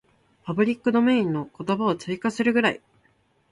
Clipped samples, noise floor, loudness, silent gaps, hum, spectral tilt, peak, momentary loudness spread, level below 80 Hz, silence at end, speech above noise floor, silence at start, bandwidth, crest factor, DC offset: under 0.1%; -64 dBFS; -23 LUFS; none; none; -6.5 dB/octave; -8 dBFS; 10 LU; -64 dBFS; 0.75 s; 42 dB; 0.45 s; 11 kHz; 18 dB; under 0.1%